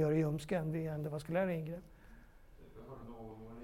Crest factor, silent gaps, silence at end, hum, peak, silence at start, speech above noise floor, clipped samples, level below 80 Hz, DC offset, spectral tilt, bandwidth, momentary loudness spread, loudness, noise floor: 16 dB; none; 0 s; none; -22 dBFS; 0 s; 21 dB; under 0.1%; -60 dBFS; under 0.1%; -8 dB/octave; 16 kHz; 18 LU; -38 LUFS; -58 dBFS